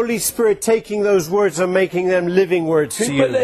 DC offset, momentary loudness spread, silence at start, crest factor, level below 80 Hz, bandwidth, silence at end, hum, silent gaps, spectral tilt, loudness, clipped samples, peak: under 0.1%; 2 LU; 0 s; 14 dB; -52 dBFS; 13.5 kHz; 0 s; none; none; -4.5 dB/octave; -17 LUFS; under 0.1%; -2 dBFS